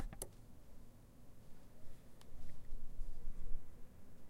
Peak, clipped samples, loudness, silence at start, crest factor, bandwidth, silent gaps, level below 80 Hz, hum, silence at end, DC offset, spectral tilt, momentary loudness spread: -24 dBFS; under 0.1%; -57 LUFS; 0 s; 16 dB; 14 kHz; none; -48 dBFS; none; 0 s; under 0.1%; -4.5 dB/octave; 12 LU